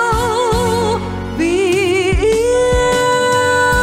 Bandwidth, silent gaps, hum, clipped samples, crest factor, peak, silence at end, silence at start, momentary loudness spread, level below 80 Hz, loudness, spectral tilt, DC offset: 16.5 kHz; none; none; under 0.1%; 10 dB; -4 dBFS; 0 s; 0 s; 5 LU; -28 dBFS; -14 LUFS; -4.5 dB/octave; under 0.1%